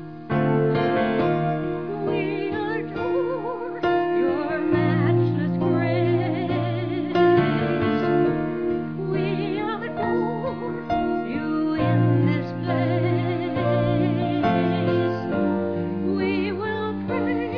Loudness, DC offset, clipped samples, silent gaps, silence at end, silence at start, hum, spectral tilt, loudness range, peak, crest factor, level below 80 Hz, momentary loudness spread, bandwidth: -23 LUFS; 0.4%; under 0.1%; none; 0 s; 0 s; none; -10 dB/octave; 3 LU; -8 dBFS; 14 dB; -52 dBFS; 6 LU; 5.4 kHz